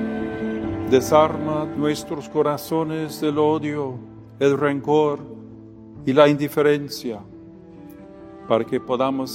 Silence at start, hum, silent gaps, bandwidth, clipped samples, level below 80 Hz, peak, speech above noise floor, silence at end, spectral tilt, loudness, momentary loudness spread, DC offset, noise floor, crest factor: 0 s; none; none; 16.5 kHz; under 0.1%; -54 dBFS; 0 dBFS; 22 dB; 0 s; -6 dB/octave; -21 LUFS; 24 LU; under 0.1%; -42 dBFS; 22 dB